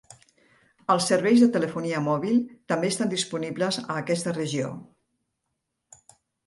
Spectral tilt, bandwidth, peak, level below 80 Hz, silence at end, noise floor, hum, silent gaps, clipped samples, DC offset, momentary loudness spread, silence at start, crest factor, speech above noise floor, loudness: -5 dB/octave; 11.5 kHz; -8 dBFS; -70 dBFS; 1.65 s; -80 dBFS; none; none; under 0.1%; under 0.1%; 10 LU; 0.1 s; 18 dB; 56 dB; -25 LUFS